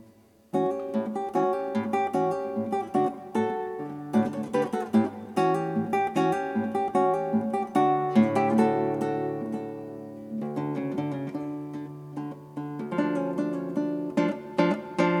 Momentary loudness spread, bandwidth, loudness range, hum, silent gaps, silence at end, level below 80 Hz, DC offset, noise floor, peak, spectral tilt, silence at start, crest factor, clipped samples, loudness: 13 LU; 12.5 kHz; 7 LU; none; none; 0 s; -72 dBFS; under 0.1%; -56 dBFS; -8 dBFS; -7.5 dB/octave; 0 s; 18 dB; under 0.1%; -28 LUFS